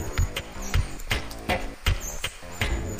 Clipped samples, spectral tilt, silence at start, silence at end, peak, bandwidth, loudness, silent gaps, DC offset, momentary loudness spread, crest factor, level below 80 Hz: under 0.1%; -4 dB/octave; 0 s; 0 s; -8 dBFS; 15.5 kHz; -30 LUFS; none; under 0.1%; 4 LU; 20 dB; -32 dBFS